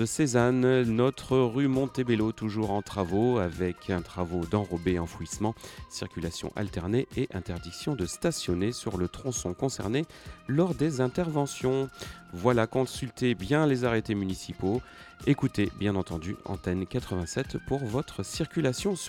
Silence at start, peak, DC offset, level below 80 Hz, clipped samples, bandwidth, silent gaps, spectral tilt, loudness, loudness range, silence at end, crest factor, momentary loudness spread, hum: 0 s; -8 dBFS; under 0.1%; -50 dBFS; under 0.1%; 17 kHz; none; -6 dB/octave; -29 LUFS; 4 LU; 0 s; 20 dB; 10 LU; none